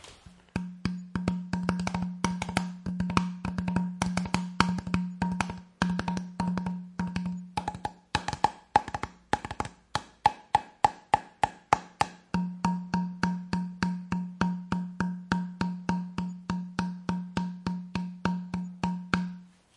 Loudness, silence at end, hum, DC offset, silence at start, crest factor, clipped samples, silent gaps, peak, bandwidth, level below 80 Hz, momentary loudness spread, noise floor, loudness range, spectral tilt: -32 LUFS; 0.3 s; none; under 0.1%; 0.05 s; 28 dB; under 0.1%; none; -4 dBFS; 11.5 kHz; -52 dBFS; 8 LU; -53 dBFS; 4 LU; -5.5 dB/octave